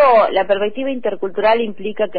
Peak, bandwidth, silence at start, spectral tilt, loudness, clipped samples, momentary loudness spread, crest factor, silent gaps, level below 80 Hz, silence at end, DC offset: -4 dBFS; 5 kHz; 0 s; -7.5 dB/octave; -17 LUFS; under 0.1%; 9 LU; 12 dB; none; -52 dBFS; 0 s; 4%